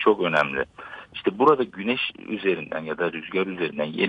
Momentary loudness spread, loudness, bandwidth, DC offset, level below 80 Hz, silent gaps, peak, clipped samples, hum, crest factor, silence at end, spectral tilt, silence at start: 10 LU; -24 LUFS; 7.6 kHz; under 0.1%; -62 dBFS; none; -6 dBFS; under 0.1%; none; 18 dB; 0 s; -6.5 dB/octave; 0 s